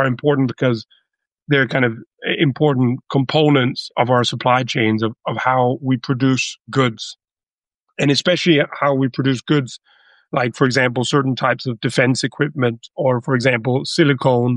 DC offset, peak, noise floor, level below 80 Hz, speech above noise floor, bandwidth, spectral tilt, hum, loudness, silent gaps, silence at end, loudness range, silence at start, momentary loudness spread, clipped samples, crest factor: under 0.1%; -2 dBFS; under -90 dBFS; -60 dBFS; over 73 dB; 11 kHz; -5.5 dB/octave; none; -18 LUFS; 7.53-7.58 s, 7.76-7.80 s; 0 s; 2 LU; 0 s; 6 LU; under 0.1%; 16 dB